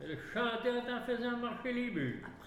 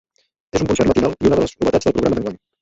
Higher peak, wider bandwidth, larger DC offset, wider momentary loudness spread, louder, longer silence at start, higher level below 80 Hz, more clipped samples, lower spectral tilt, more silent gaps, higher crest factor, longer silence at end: second, -22 dBFS vs -2 dBFS; first, 13 kHz vs 8 kHz; neither; second, 4 LU vs 7 LU; second, -37 LUFS vs -18 LUFS; second, 0 s vs 0.55 s; second, -64 dBFS vs -38 dBFS; neither; about the same, -6.5 dB/octave vs -6 dB/octave; neither; about the same, 14 dB vs 16 dB; second, 0 s vs 0.25 s